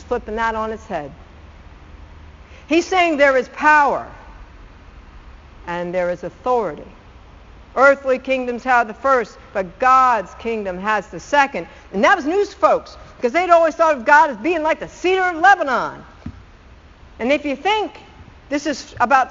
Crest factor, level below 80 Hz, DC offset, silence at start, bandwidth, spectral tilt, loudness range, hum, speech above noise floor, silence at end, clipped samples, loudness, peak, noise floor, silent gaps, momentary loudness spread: 18 dB; -44 dBFS; under 0.1%; 0 s; 7.6 kHz; -2 dB/octave; 7 LU; none; 27 dB; 0 s; under 0.1%; -17 LUFS; 0 dBFS; -44 dBFS; none; 15 LU